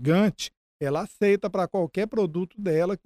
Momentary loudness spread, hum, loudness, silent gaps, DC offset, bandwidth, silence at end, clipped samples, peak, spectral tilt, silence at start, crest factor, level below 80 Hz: 8 LU; none; -26 LUFS; 0.57-0.80 s; under 0.1%; 14 kHz; 0.1 s; under 0.1%; -10 dBFS; -6.5 dB/octave; 0 s; 14 dB; -58 dBFS